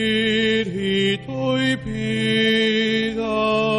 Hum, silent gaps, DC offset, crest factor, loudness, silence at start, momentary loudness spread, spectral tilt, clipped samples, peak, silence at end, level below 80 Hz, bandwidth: none; none; under 0.1%; 12 dB; -20 LUFS; 0 s; 5 LU; -5 dB/octave; under 0.1%; -8 dBFS; 0 s; -48 dBFS; 11 kHz